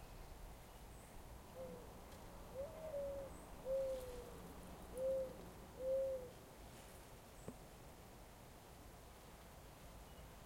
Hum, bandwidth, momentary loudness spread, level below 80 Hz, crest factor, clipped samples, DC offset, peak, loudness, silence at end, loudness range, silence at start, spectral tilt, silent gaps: none; 16.5 kHz; 16 LU; -62 dBFS; 16 dB; under 0.1%; under 0.1%; -34 dBFS; -51 LUFS; 0 s; 12 LU; 0 s; -5 dB/octave; none